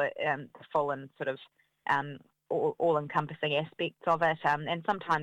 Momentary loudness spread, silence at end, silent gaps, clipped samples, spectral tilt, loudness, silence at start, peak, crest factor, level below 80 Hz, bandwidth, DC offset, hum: 9 LU; 0 s; none; under 0.1%; -6.5 dB/octave; -31 LUFS; 0 s; -12 dBFS; 18 dB; -72 dBFS; 11.5 kHz; under 0.1%; none